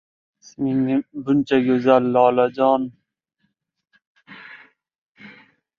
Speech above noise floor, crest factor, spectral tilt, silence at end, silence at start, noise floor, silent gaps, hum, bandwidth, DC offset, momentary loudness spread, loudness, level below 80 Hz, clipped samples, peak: 54 dB; 20 dB; -7.5 dB/octave; 0.5 s; 0.6 s; -72 dBFS; 4.07-4.15 s, 4.98-5.15 s; none; 6.8 kHz; under 0.1%; 12 LU; -19 LUFS; -64 dBFS; under 0.1%; -2 dBFS